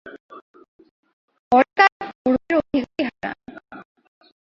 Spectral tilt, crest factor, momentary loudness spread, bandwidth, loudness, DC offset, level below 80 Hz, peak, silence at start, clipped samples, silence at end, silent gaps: -6 dB/octave; 22 dB; 23 LU; 7.2 kHz; -20 LUFS; under 0.1%; -58 dBFS; 0 dBFS; 0.05 s; under 0.1%; 0.6 s; 0.20-0.29 s, 0.42-0.54 s, 0.68-0.79 s, 0.91-1.03 s, 1.13-1.28 s, 1.39-1.51 s, 1.92-2.00 s, 2.15-2.25 s